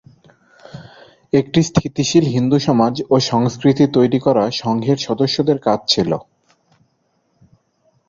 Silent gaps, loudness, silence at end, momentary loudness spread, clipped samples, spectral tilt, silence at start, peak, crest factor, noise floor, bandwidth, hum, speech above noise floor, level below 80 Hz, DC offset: none; -16 LUFS; 1.9 s; 5 LU; under 0.1%; -6 dB/octave; 0.75 s; -2 dBFS; 16 dB; -64 dBFS; 7.6 kHz; none; 49 dB; -50 dBFS; under 0.1%